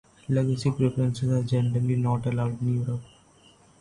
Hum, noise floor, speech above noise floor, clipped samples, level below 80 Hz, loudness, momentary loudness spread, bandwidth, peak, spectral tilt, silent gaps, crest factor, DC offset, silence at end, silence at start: none; -57 dBFS; 32 dB; under 0.1%; -54 dBFS; -26 LUFS; 4 LU; 11 kHz; -12 dBFS; -8 dB/octave; none; 14 dB; under 0.1%; 0.75 s; 0.3 s